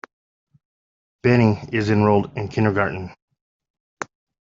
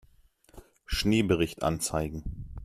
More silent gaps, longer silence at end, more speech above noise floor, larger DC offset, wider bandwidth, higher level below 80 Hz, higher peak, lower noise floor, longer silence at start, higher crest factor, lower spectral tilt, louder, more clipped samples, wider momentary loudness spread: first, 3.22-3.28 s, 3.41-3.60 s, 3.70-3.74 s, 3.80-3.97 s vs none; first, 0.35 s vs 0 s; first, over 71 dB vs 33 dB; neither; second, 7.6 kHz vs 15.5 kHz; second, -54 dBFS vs -42 dBFS; first, -2 dBFS vs -10 dBFS; first, under -90 dBFS vs -61 dBFS; first, 1.25 s vs 0.55 s; about the same, 20 dB vs 20 dB; first, -8 dB/octave vs -5 dB/octave; first, -20 LUFS vs -29 LUFS; neither; first, 18 LU vs 12 LU